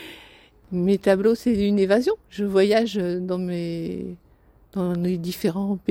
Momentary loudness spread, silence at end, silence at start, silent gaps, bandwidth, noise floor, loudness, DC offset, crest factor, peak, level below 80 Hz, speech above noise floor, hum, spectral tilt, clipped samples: 12 LU; 0.1 s; 0 s; none; 17.5 kHz; -55 dBFS; -23 LUFS; under 0.1%; 18 dB; -6 dBFS; -52 dBFS; 33 dB; none; -7 dB/octave; under 0.1%